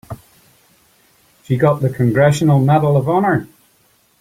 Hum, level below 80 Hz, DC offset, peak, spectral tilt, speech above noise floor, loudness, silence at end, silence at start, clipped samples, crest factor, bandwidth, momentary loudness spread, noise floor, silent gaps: none; -50 dBFS; under 0.1%; 0 dBFS; -7.5 dB/octave; 43 dB; -15 LUFS; 0.75 s; 0.1 s; under 0.1%; 16 dB; 15.5 kHz; 9 LU; -56 dBFS; none